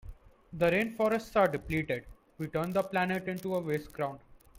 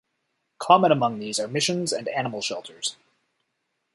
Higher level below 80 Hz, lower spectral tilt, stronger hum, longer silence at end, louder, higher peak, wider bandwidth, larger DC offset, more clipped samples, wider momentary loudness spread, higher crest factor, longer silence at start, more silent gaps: first, -54 dBFS vs -70 dBFS; first, -6.5 dB/octave vs -3.5 dB/octave; neither; second, 0 s vs 1 s; second, -31 LUFS vs -24 LUFS; second, -14 dBFS vs -2 dBFS; first, 16.5 kHz vs 11.5 kHz; neither; neither; second, 10 LU vs 13 LU; second, 18 dB vs 24 dB; second, 0.05 s vs 0.6 s; neither